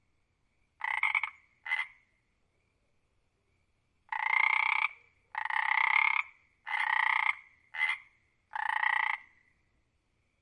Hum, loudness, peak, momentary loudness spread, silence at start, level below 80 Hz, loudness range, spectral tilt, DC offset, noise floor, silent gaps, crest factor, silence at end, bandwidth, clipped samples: none; -30 LUFS; -12 dBFS; 16 LU; 0.85 s; -80 dBFS; 7 LU; 1 dB/octave; under 0.1%; -75 dBFS; none; 22 dB; 1.2 s; 10.5 kHz; under 0.1%